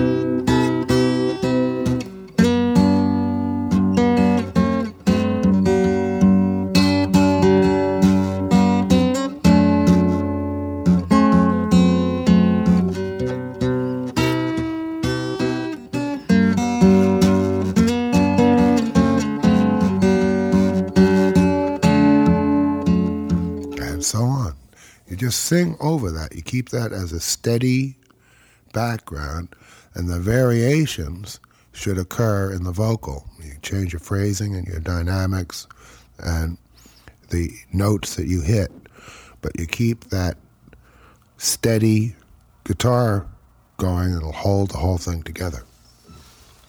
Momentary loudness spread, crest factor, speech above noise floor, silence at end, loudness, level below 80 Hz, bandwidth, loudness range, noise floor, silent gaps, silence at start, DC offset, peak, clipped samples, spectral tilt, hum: 12 LU; 16 dB; 33 dB; 0.5 s; -19 LUFS; -38 dBFS; 18 kHz; 8 LU; -54 dBFS; none; 0 s; under 0.1%; -2 dBFS; under 0.1%; -6.5 dB/octave; none